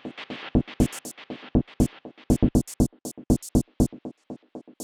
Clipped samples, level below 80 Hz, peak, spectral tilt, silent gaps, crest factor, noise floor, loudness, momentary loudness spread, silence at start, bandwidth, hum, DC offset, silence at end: under 0.1%; -34 dBFS; -6 dBFS; -6.5 dB/octave; none; 20 dB; -42 dBFS; -26 LUFS; 18 LU; 0.05 s; 17.5 kHz; none; under 0.1%; 0 s